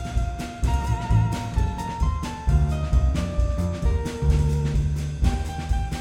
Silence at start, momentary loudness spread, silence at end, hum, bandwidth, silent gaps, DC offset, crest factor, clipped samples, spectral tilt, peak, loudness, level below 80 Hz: 0 s; 5 LU; 0 s; none; 12 kHz; none; under 0.1%; 14 dB; under 0.1%; -7 dB/octave; -8 dBFS; -25 LUFS; -24 dBFS